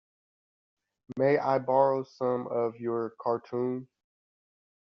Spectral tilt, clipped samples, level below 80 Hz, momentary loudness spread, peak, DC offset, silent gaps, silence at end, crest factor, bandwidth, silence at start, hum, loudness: -6.5 dB/octave; under 0.1%; -78 dBFS; 8 LU; -10 dBFS; under 0.1%; none; 1.05 s; 20 dB; 6.2 kHz; 1.1 s; none; -29 LUFS